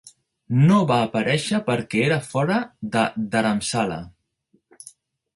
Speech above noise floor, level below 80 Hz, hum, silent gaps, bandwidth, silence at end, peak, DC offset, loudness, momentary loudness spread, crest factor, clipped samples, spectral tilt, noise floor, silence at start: 45 dB; -58 dBFS; none; none; 11.5 kHz; 1.25 s; -4 dBFS; under 0.1%; -21 LUFS; 8 LU; 18 dB; under 0.1%; -6 dB/octave; -66 dBFS; 0.05 s